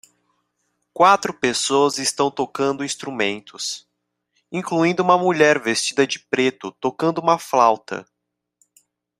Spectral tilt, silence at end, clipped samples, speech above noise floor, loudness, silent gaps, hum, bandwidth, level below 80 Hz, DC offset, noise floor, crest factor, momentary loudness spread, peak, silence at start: -3.5 dB/octave; 1.2 s; under 0.1%; 60 dB; -19 LUFS; none; none; 15.5 kHz; -68 dBFS; under 0.1%; -80 dBFS; 20 dB; 12 LU; -2 dBFS; 0.95 s